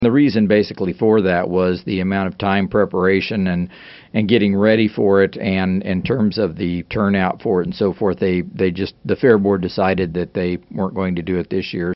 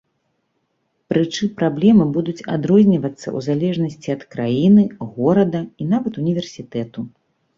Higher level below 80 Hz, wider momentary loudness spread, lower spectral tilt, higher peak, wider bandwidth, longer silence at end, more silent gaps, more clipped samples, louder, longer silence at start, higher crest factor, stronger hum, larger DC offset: first, -48 dBFS vs -56 dBFS; second, 8 LU vs 13 LU; second, -6 dB/octave vs -7.5 dB/octave; first, 0 dBFS vs -4 dBFS; second, 6 kHz vs 7.4 kHz; second, 0 s vs 0.5 s; neither; neither; about the same, -18 LUFS vs -18 LUFS; second, 0 s vs 1.1 s; about the same, 16 dB vs 16 dB; neither; neither